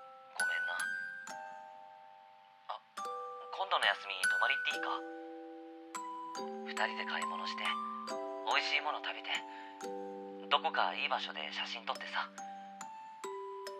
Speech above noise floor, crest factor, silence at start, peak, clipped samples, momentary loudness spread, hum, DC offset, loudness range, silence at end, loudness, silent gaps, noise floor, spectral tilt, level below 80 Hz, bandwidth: 23 dB; 26 dB; 0 s; -12 dBFS; under 0.1%; 17 LU; none; under 0.1%; 4 LU; 0 s; -37 LUFS; none; -60 dBFS; -1 dB/octave; under -90 dBFS; 15 kHz